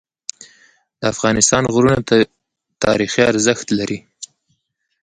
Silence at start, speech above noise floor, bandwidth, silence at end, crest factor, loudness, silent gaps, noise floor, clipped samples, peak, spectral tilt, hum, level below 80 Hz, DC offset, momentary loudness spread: 0.4 s; 53 dB; 11.5 kHz; 0.8 s; 18 dB; -16 LUFS; none; -69 dBFS; under 0.1%; 0 dBFS; -4 dB/octave; none; -46 dBFS; under 0.1%; 18 LU